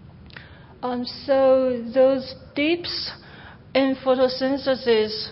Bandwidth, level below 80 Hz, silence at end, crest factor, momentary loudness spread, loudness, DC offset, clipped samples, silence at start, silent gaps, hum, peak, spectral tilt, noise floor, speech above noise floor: 5.8 kHz; -54 dBFS; 0 s; 16 dB; 14 LU; -22 LUFS; under 0.1%; under 0.1%; 0.05 s; none; none; -6 dBFS; -8.5 dB/octave; -44 dBFS; 23 dB